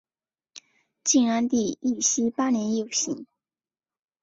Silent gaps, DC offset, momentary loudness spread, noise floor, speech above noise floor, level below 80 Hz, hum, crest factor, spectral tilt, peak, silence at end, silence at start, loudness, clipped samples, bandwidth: none; under 0.1%; 8 LU; under -90 dBFS; over 66 dB; -68 dBFS; none; 18 dB; -3 dB/octave; -8 dBFS; 1 s; 0.55 s; -24 LUFS; under 0.1%; 8 kHz